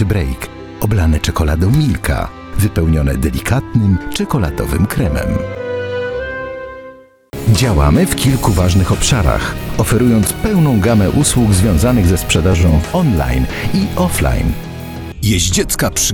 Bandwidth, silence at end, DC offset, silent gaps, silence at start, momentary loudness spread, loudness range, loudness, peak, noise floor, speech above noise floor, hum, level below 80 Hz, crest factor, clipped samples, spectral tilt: 19.5 kHz; 0 s; under 0.1%; none; 0 s; 10 LU; 5 LU; -14 LUFS; 0 dBFS; -37 dBFS; 25 dB; none; -22 dBFS; 14 dB; under 0.1%; -5.5 dB/octave